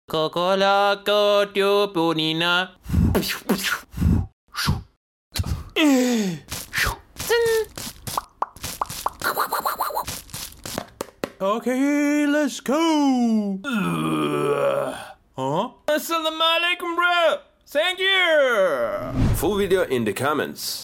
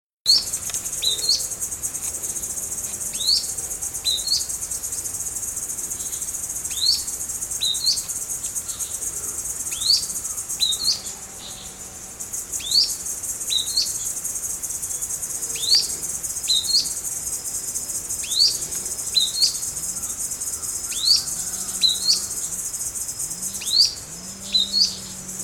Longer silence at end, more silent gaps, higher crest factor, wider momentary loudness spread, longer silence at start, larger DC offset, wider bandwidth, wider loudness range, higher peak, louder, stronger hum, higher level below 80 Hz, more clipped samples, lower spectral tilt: about the same, 0 s vs 0 s; first, 4.33-4.47 s, 4.97-5.31 s vs none; about the same, 16 dB vs 20 dB; first, 12 LU vs 9 LU; second, 0.1 s vs 0.25 s; neither; about the same, 17 kHz vs 18 kHz; about the same, 5 LU vs 3 LU; about the same, -6 dBFS vs -6 dBFS; about the same, -22 LUFS vs -21 LUFS; neither; first, -38 dBFS vs -52 dBFS; neither; first, -4.5 dB/octave vs 1 dB/octave